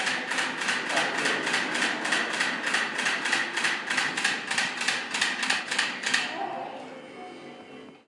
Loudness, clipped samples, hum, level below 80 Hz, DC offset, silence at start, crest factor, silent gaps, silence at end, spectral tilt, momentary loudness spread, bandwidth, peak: -26 LUFS; under 0.1%; none; -82 dBFS; under 0.1%; 0 s; 20 dB; none; 0.1 s; -0.5 dB/octave; 17 LU; 11.5 kHz; -8 dBFS